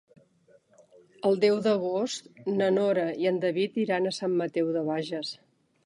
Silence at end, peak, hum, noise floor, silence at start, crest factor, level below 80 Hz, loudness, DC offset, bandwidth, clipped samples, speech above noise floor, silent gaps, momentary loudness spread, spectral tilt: 0.5 s; -10 dBFS; none; -62 dBFS; 1.25 s; 18 dB; -80 dBFS; -27 LUFS; under 0.1%; 11 kHz; under 0.1%; 36 dB; none; 10 LU; -5.5 dB/octave